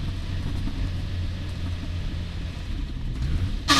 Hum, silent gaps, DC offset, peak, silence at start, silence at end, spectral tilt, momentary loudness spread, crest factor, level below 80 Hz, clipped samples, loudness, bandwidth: none; none; under 0.1%; -4 dBFS; 0 s; 0 s; -4 dB/octave; 5 LU; 22 dB; -30 dBFS; under 0.1%; -31 LUFS; 13 kHz